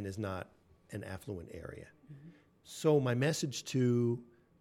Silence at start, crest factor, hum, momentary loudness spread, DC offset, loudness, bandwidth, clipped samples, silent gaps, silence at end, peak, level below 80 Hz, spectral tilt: 0 s; 18 dB; none; 23 LU; under 0.1%; -34 LUFS; 16 kHz; under 0.1%; none; 0.35 s; -16 dBFS; -68 dBFS; -6 dB/octave